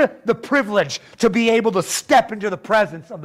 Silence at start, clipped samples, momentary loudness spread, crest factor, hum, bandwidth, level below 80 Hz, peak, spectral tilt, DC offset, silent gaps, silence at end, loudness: 0 s; under 0.1%; 8 LU; 14 dB; none; 16 kHz; -56 dBFS; -6 dBFS; -4 dB/octave; under 0.1%; none; 0 s; -19 LUFS